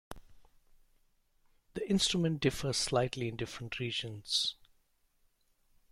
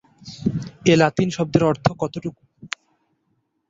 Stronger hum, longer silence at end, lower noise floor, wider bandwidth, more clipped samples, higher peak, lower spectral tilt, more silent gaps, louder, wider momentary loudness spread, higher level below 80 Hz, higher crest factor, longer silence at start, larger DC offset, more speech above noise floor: neither; first, 1.4 s vs 1 s; about the same, -72 dBFS vs -70 dBFS; first, 16 kHz vs 7.8 kHz; neither; second, -16 dBFS vs -2 dBFS; second, -4 dB/octave vs -6 dB/octave; neither; second, -33 LUFS vs -21 LUFS; second, 12 LU vs 17 LU; second, -58 dBFS vs -52 dBFS; about the same, 20 dB vs 20 dB; second, 0.1 s vs 0.25 s; neither; second, 39 dB vs 50 dB